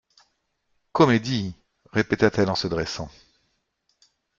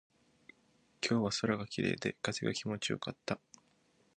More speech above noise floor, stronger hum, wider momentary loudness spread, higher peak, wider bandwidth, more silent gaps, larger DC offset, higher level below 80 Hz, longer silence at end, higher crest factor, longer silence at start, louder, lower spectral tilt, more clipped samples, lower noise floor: first, 50 dB vs 36 dB; neither; first, 14 LU vs 8 LU; first, -4 dBFS vs -16 dBFS; second, 7.6 kHz vs 10 kHz; neither; neither; first, -54 dBFS vs -68 dBFS; first, 1.3 s vs 0.8 s; about the same, 22 dB vs 22 dB; about the same, 0.95 s vs 1 s; first, -23 LUFS vs -36 LUFS; first, -6 dB/octave vs -4.5 dB/octave; neither; about the same, -72 dBFS vs -71 dBFS